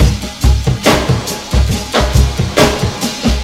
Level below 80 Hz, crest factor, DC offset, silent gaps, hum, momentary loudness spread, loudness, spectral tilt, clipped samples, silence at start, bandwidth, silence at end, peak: -16 dBFS; 12 dB; under 0.1%; none; none; 5 LU; -13 LUFS; -5 dB/octave; 0.3%; 0 s; 16.5 kHz; 0 s; 0 dBFS